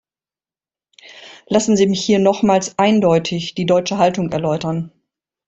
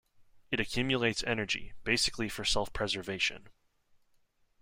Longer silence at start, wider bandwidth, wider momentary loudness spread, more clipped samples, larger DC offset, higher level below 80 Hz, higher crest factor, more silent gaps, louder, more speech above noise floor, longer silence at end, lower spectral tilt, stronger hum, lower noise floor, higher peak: first, 1.05 s vs 0.2 s; second, 8.2 kHz vs 16 kHz; about the same, 8 LU vs 6 LU; neither; neither; about the same, -54 dBFS vs -50 dBFS; second, 16 dB vs 22 dB; neither; first, -16 LUFS vs -32 LUFS; first, over 74 dB vs 37 dB; second, 0.6 s vs 1.1 s; first, -5.5 dB/octave vs -3 dB/octave; neither; first, under -90 dBFS vs -70 dBFS; first, -2 dBFS vs -14 dBFS